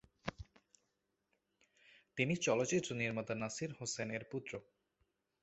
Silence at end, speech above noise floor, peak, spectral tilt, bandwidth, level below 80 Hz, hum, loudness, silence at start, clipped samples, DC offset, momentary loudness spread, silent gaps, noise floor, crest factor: 0.8 s; 46 dB; -18 dBFS; -4.5 dB/octave; 8.2 kHz; -68 dBFS; none; -39 LUFS; 0.25 s; under 0.1%; under 0.1%; 15 LU; none; -85 dBFS; 24 dB